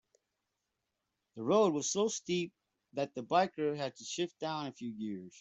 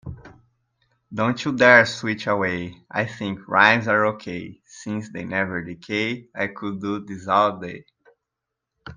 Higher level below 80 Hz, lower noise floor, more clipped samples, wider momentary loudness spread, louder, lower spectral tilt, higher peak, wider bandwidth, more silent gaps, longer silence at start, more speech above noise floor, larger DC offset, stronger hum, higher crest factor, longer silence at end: second, -80 dBFS vs -58 dBFS; about the same, -86 dBFS vs -83 dBFS; neither; second, 13 LU vs 19 LU; second, -35 LUFS vs -21 LUFS; about the same, -4 dB/octave vs -5 dB/octave; second, -16 dBFS vs 0 dBFS; second, 8.2 kHz vs 9.8 kHz; neither; first, 1.35 s vs 0.05 s; second, 52 dB vs 61 dB; neither; neither; about the same, 20 dB vs 22 dB; about the same, 0 s vs 0 s